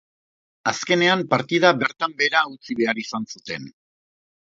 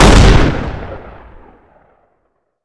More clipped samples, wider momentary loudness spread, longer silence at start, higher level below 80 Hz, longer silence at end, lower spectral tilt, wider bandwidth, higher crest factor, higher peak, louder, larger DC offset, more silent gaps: second, under 0.1% vs 1%; second, 13 LU vs 23 LU; first, 0.65 s vs 0 s; second, -68 dBFS vs -16 dBFS; second, 0.85 s vs 1.55 s; second, -4 dB/octave vs -5.5 dB/octave; second, 7.8 kHz vs 11 kHz; first, 22 dB vs 12 dB; about the same, 0 dBFS vs 0 dBFS; second, -21 LUFS vs -11 LUFS; neither; neither